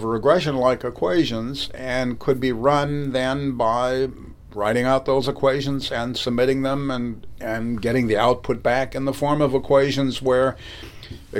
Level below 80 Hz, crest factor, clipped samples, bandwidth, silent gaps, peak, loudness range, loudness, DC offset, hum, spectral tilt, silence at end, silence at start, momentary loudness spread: -44 dBFS; 18 dB; under 0.1%; 16.5 kHz; none; -4 dBFS; 2 LU; -21 LUFS; under 0.1%; none; -6 dB/octave; 0 s; 0 s; 9 LU